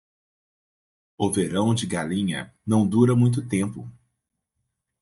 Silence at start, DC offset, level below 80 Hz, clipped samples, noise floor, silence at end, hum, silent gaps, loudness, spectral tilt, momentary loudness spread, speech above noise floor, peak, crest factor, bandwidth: 1.2 s; under 0.1%; -62 dBFS; under 0.1%; -79 dBFS; 1.1 s; none; none; -23 LUFS; -6.5 dB/octave; 12 LU; 57 dB; -6 dBFS; 20 dB; 11.5 kHz